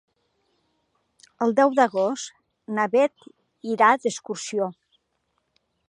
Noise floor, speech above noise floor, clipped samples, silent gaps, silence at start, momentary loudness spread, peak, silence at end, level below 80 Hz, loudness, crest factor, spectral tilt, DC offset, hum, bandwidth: -74 dBFS; 52 dB; under 0.1%; none; 1.4 s; 12 LU; -4 dBFS; 1.2 s; -80 dBFS; -23 LUFS; 20 dB; -4 dB/octave; under 0.1%; none; 11 kHz